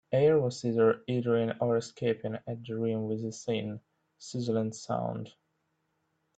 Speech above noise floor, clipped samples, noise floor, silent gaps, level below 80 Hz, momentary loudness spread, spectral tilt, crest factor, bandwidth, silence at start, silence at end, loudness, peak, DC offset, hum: 48 dB; under 0.1%; -78 dBFS; none; -70 dBFS; 14 LU; -6.5 dB/octave; 18 dB; 8.8 kHz; 0.1 s; 1.1 s; -31 LUFS; -14 dBFS; under 0.1%; none